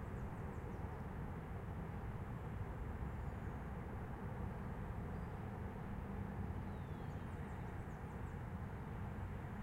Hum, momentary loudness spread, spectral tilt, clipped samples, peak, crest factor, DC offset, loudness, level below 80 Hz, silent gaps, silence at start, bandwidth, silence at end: none; 1 LU; -8.5 dB/octave; under 0.1%; -32 dBFS; 14 dB; under 0.1%; -48 LUFS; -52 dBFS; none; 0 s; 16 kHz; 0 s